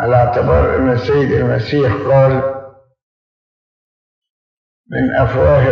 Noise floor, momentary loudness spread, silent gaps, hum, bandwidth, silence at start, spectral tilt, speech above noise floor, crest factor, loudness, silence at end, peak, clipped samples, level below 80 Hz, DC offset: under -90 dBFS; 7 LU; 3.03-4.22 s, 4.30-4.84 s; none; 6.4 kHz; 0 s; -9 dB/octave; over 78 dB; 14 dB; -14 LUFS; 0 s; 0 dBFS; under 0.1%; -32 dBFS; under 0.1%